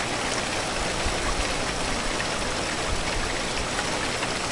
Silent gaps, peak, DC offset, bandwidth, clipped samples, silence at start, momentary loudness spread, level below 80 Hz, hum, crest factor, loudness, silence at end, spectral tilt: none; -10 dBFS; under 0.1%; 11.5 kHz; under 0.1%; 0 s; 1 LU; -36 dBFS; none; 16 dB; -26 LUFS; 0 s; -2.5 dB/octave